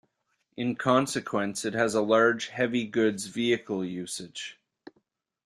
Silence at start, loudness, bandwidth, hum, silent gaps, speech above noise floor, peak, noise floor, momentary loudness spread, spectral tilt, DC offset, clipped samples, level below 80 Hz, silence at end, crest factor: 0.55 s; -27 LUFS; 14 kHz; none; none; 49 dB; -8 dBFS; -76 dBFS; 13 LU; -4.5 dB/octave; under 0.1%; under 0.1%; -70 dBFS; 0.95 s; 20 dB